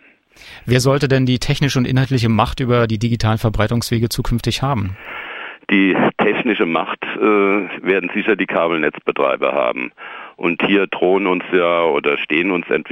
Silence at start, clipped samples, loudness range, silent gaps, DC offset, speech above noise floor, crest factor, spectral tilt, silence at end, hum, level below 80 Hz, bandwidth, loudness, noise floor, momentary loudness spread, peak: 0.4 s; under 0.1%; 2 LU; none; under 0.1%; 28 dB; 16 dB; -6 dB/octave; 0 s; none; -36 dBFS; 16 kHz; -17 LUFS; -45 dBFS; 8 LU; -2 dBFS